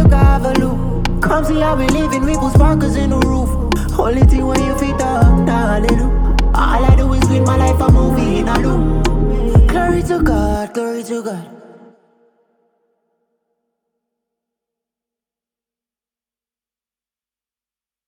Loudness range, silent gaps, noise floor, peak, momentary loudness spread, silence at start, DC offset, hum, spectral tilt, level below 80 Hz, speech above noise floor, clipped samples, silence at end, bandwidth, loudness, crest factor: 8 LU; none; under -90 dBFS; 0 dBFS; 7 LU; 0 s; under 0.1%; none; -7 dB/octave; -18 dBFS; over 77 dB; under 0.1%; 6.5 s; 17 kHz; -15 LUFS; 14 dB